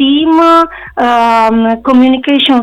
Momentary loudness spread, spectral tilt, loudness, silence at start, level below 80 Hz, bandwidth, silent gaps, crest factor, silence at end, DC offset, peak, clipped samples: 5 LU; -5 dB/octave; -8 LUFS; 0 s; -42 dBFS; 10.5 kHz; none; 8 dB; 0 s; under 0.1%; 0 dBFS; under 0.1%